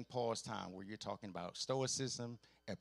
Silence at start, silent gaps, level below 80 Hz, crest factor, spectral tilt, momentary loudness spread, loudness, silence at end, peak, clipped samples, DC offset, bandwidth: 0 s; none; -78 dBFS; 18 dB; -4 dB/octave; 11 LU; -43 LUFS; 0.05 s; -26 dBFS; under 0.1%; under 0.1%; 12.5 kHz